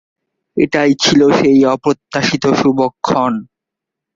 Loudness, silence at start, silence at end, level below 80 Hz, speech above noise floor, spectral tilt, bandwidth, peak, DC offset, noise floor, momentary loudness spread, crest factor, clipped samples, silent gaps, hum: -13 LUFS; 0.55 s; 0.7 s; -50 dBFS; 69 dB; -5 dB/octave; 7.6 kHz; 0 dBFS; under 0.1%; -82 dBFS; 8 LU; 14 dB; under 0.1%; none; none